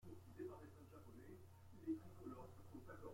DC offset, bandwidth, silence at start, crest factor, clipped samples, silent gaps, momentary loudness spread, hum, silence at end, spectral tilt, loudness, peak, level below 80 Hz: under 0.1%; 16.5 kHz; 0 s; 18 dB; under 0.1%; none; 12 LU; none; 0 s; -7.5 dB/octave; -57 LUFS; -36 dBFS; -74 dBFS